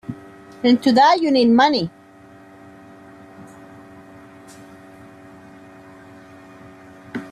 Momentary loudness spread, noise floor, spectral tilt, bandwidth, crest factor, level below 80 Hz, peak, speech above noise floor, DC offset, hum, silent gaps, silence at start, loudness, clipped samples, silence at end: 24 LU; -46 dBFS; -5.5 dB/octave; 11 kHz; 18 dB; -62 dBFS; -4 dBFS; 31 dB; under 0.1%; none; none; 0.1 s; -16 LUFS; under 0.1%; 0.05 s